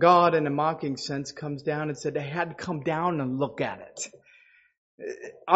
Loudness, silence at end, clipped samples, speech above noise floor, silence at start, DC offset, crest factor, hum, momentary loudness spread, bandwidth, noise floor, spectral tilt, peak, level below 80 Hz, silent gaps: -28 LUFS; 0 s; under 0.1%; 32 dB; 0 s; under 0.1%; 24 dB; none; 15 LU; 8 kHz; -59 dBFS; -5 dB/octave; -4 dBFS; -66 dBFS; 4.78-4.98 s